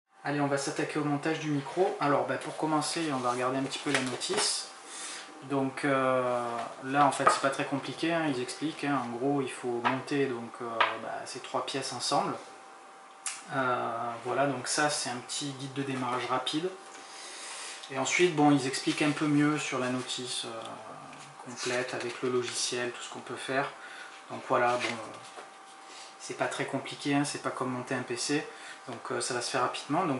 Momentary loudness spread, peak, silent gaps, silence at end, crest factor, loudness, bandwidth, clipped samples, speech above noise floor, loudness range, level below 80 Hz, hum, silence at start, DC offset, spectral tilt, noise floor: 16 LU; -8 dBFS; none; 0 s; 24 dB; -31 LUFS; 11.5 kHz; under 0.1%; 20 dB; 5 LU; -82 dBFS; none; 0.2 s; under 0.1%; -4 dB/octave; -51 dBFS